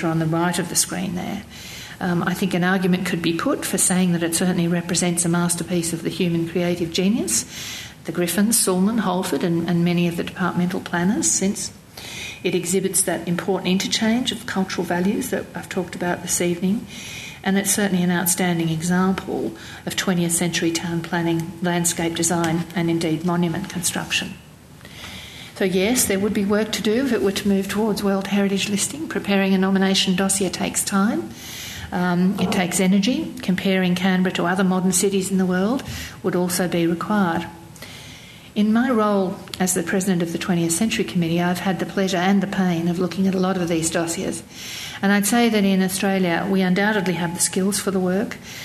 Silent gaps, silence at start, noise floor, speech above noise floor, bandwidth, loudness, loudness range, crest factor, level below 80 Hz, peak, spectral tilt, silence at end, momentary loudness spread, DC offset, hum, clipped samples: none; 0 s; -43 dBFS; 22 dB; 14 kHz; -21 LUFS; 3 LU; 16 dB; -52 dBFS; -4 dBFS; -4.5 dB/octave; 0 s; 10 LU; under 0.1%; none; under 0.1%